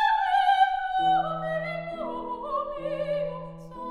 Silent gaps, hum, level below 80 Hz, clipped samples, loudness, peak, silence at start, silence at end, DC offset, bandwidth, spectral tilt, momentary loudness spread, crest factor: none; none; -54 dBFS; under 0.1%; -27 LUFS; -10 dBFS; 0 s; 0 s; under 0.1%; 11 kHz; -5.5 dB/octave; 12 LU; 16 dB